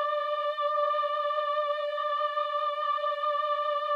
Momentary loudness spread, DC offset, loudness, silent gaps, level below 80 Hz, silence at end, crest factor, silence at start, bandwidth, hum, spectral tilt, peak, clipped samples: 2 LU; under 0.1%; -29 LUFS; none; under -90 dBFS; 0 s; 12 dB; 0 s; 6.8 kHz; none; 1 dB/octave; -16 dBFS; under 0.1%